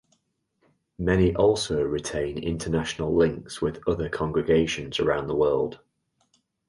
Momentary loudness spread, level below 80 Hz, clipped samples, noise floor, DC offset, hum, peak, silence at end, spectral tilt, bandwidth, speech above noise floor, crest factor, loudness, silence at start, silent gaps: 7 LU; -44 dBFS; under 0.1%; -72 dBFS; under 0.1%; none; -8 dBFS; 0.95 s; -5.5 dB/octave; 11.5 kHz; 48 dB; 18 dB; -25 LUFS; 1 s; none